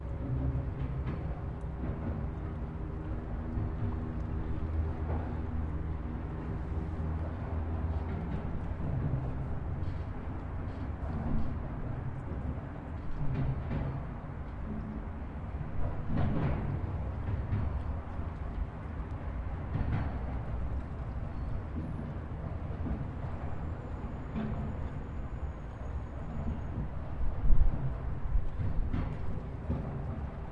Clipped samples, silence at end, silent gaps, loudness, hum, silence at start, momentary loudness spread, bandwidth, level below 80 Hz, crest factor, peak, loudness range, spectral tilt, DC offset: under 0.1%; 0 s; none; -37 LUFS; none; 0 s; 6 LU; 4.7 kHz; -38 dBFS; 24 dB; -10 dBFS; 3 LU; -10 dB/octave; under 0.1%